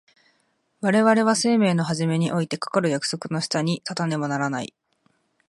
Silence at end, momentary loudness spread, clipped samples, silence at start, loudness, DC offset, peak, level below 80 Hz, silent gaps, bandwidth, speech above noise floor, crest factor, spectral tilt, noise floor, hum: 0.8 s; 9 LU; under 0.1%; 0.8 s; -23 LUFS; under 0.1%; -4 dBFS; -68 dBFS; none; 11.5 kHz; 46 dB; 18 dB; -5 dB/octave; -68 dBFS; none